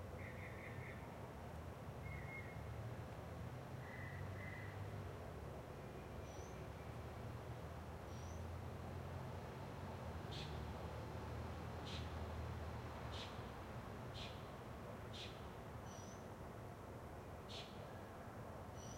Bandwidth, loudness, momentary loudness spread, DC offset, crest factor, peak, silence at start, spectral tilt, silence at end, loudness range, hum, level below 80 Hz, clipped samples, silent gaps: 16 kHz; -52 LUFS; 4 LU; under 0.1%; 14 dB; -36 dBFS; 0 s; -5.5 dB/octave; 0 s; 3 LU; none; -62 dBFS; under 0.1%; none